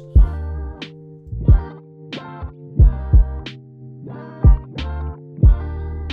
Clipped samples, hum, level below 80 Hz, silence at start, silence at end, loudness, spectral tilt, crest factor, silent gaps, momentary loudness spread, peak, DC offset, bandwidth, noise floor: under 0.1%; none; -18 dBFS; 0 s; 0 s; -19 LUFS; -9 dB/octave; 14 dB; none; 19 LU; -4 dBFS; under 0.1%; 4.8 kHz; -38 dBFS